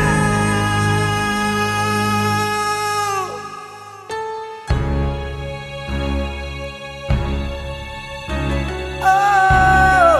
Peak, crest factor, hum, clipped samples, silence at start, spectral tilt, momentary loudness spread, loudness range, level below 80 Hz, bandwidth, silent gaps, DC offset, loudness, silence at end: -2 dBFS; 16 dB; none; under 0.1%; 0 s; -5 dB/octave; 16 LU; 7 LU; -28 dBFS; 13.5 kHz; none; under 0.1%; -18 LUFS; 0 s